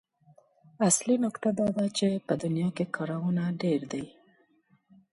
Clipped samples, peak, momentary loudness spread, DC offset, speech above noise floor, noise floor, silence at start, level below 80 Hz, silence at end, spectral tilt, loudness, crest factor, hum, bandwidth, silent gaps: under 0.1%; -10 dBFS; 7 LU; under 0.1%; 39 dB; -67 dBFS; 0.8 s; -68 dBFS; 1.05 s; -5 dB/octave; -28 LUFS; 20 dB; none; 11.5 kHz; none